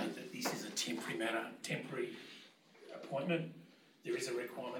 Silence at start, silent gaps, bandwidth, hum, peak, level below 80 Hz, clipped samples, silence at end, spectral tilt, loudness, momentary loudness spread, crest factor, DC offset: 0 s; none; 18 kHz; none; -24 dBFS; under -90 dBFS; under 0.1%; 0 s; -3.5 dB/octave; -41 LUFS; 16 LU; 18 dB; under 0.1%